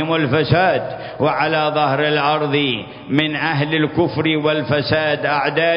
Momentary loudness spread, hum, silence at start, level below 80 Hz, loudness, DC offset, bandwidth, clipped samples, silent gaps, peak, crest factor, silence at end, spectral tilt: 5 LU; none; 0 s; -48 dBFS; -17 LUFS; under 0.1%; 5.4 kHz; under 0.1%; none; 0 dBFS; 18 dB; 0 s; -9 dB/octave